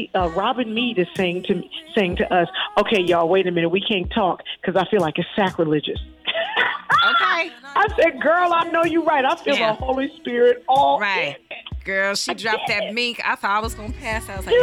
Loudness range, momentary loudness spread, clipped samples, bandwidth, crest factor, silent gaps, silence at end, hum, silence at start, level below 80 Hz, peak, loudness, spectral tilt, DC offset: 3 LU; 8 LU; under 0.1%; 16 kHz; 12 dB; none; 0 s; none; 0 s; -42 dBFS; -8 dBFS; -20 LUFS; -4.5 dB/octave; under 0.1%